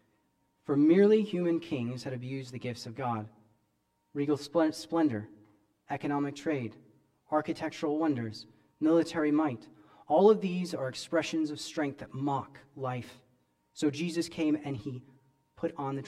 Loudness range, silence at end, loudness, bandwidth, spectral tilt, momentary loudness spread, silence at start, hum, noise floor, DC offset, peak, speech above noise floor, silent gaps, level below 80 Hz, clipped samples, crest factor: 6 LU; 0 s; -31 LUFS; 12.5 kHz; -6.5 dB/octave; 16 LU; 0.7 s; none; -76 dBFS; under 0.1%; -10 dBFS; 46 dB; none; -72 dBFS; under 0.1%; 20 dB